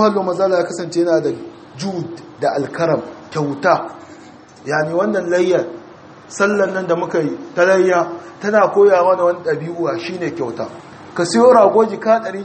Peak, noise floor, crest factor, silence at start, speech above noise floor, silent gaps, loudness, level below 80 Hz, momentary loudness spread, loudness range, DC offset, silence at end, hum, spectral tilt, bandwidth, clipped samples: 0 dBFS; -40 dBFS; 16 dB; 0 s; 25 dB; none; -16 LUFS; -64 dBFS; 17 LU; 5 LU; under 0.1%; 0 s; none; -5.5 dB/octave; 8.8 kHz; under 0.1%